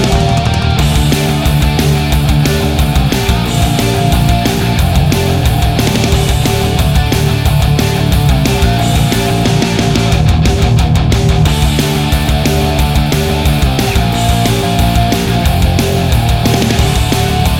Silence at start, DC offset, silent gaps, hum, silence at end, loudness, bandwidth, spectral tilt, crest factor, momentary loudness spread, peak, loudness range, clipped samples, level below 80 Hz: 0 s; under 0.1%; none; none; 0 s; -11 LUFS; 17 kHz; -5.5 dB/octave; 10 dB; 2 LU; 0 dBFS; 1 LU; under 0.1%; -16 dBFS